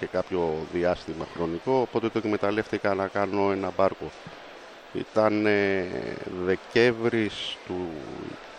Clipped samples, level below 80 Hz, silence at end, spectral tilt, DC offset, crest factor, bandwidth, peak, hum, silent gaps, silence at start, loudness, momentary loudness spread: under 0.1%; -58 dBFS; 0 s; -6 dB/octave; under 0.1%; 20 dB; 9.8 kHz; -6 dBFS; none; none; 0 s; -27 LUFS; 15 LU